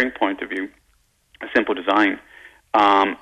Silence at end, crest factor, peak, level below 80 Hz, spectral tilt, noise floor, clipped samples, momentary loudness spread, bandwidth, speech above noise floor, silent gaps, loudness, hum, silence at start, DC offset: 0.05 s; 16 dB; -6 dBFS; -58 dBFS; -4.5 dB/octave; -62 dBFS; under 0.1%; 16 LU; 9.6 kHz; 43 dB; none; -20 LUFS; none; 0 s; under 0.1%